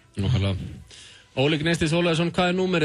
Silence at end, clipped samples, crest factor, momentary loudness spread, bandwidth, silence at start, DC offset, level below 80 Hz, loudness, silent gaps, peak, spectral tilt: 0 s; under 0.1%; 14 dB; 15 LU; 12 kHz; 0.15 s; under 0.1%; -42 dBFS; -23 LUFS; none; -10 dBFS; -6 dB/octave